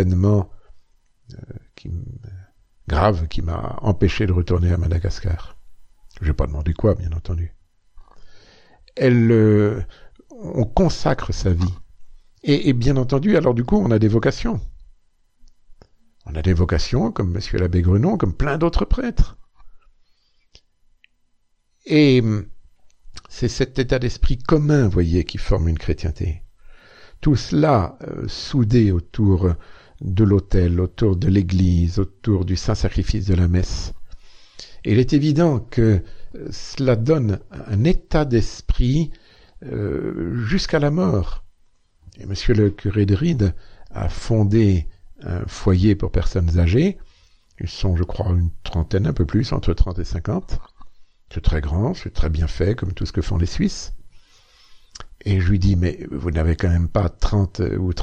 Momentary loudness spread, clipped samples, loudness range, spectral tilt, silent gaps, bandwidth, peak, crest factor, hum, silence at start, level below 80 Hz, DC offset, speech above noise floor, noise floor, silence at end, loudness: 15 LU; under 0.1%; 5 LU; -7.5 dB/octave; none; 8.4 kHz; -2 dBFS; 18 dB; none; 0 s; -28 dBFS; under 0.1%; 44 dB; -62 dBFS; 0 s; -20 LUFS